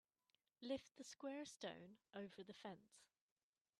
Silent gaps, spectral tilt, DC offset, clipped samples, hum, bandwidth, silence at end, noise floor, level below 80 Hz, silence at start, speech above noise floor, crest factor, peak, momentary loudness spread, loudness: none; -4 dB/octave; under 0.1%; under 0.1%; none; 12.5 kHz; 0.75 s; under -90 dBFS; -90 dBFS; 0.6 s; over 36 dB; 22 dB; -34 dBFS; 9 LU; -55 LUFS